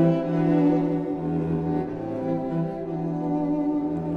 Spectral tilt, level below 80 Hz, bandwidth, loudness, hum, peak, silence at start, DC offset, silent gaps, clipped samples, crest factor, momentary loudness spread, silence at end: -10.5 dB/octave; -52 dBFS; 5 kHz; -25 LUFS; none; -8 dBFS; 0 s; under 0.1%; none; under 0.1%; 16 dB; 8 LU; 0 s